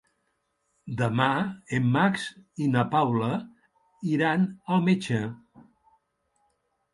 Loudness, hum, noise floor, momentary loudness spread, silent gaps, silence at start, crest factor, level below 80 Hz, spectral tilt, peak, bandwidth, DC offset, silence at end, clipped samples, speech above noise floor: -26 LUFS; none; -75 dBFS; 10 LU; none; 0.85 s; 20 dB; -64 dBFS; -7 dB/octave; -8 dBFS; 11.5 kHz; under 0.1%; 1.6 s; under 0.1%; 50 dB